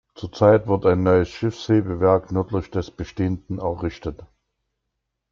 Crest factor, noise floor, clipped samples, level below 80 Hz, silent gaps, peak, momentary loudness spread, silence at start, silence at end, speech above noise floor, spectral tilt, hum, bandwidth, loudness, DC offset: 18 dB; -79 dBFS; under 0.1%; -46 dBFS; none; -4 dBFS; 12 LU; 0.2 s; 1.1 s; 58 dB; -8 dB/octave; none; 7.2 kHz; -21 LUFS; under 0.1%